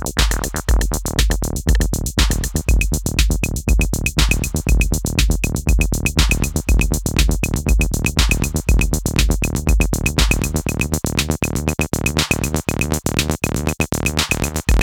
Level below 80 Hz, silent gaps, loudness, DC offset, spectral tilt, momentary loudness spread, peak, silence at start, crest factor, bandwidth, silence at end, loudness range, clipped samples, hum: -20 dBFS; none; -19 LUFS; under 0.1%; -4 dB/octave; 3 LU; 0 dBFS; 0 s; 18 dB; 19 kHz; 0 s; 1 LU; under 0.1%; none